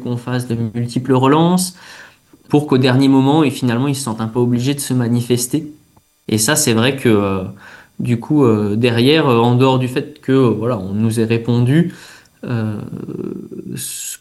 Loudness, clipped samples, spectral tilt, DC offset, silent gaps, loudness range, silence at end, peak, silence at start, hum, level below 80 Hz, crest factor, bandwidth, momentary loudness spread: -16 LUFS; under 0.1%; -5.5 dB/octave; under 0.1%; none; 3 LU; 0.05 s; 0 dBFS; 0 s; none; -54 dBFS; 16 dB; 12.5 kHz; 13 LU